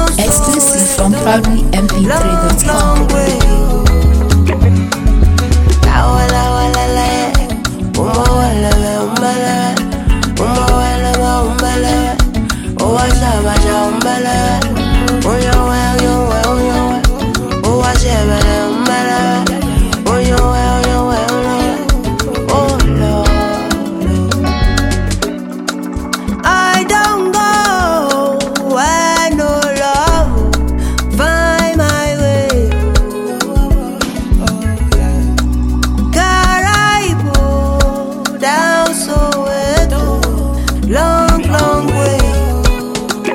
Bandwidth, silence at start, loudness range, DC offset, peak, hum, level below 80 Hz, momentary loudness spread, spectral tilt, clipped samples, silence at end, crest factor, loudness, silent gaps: 17 kHz; 0 s; 2 LU; under 0.1%; 0 dBFS; none; -16 dBFS; 5 LU; -4.5 dB/octave; under 0.1%; 0 s; 12 dB; -12 LUFS; none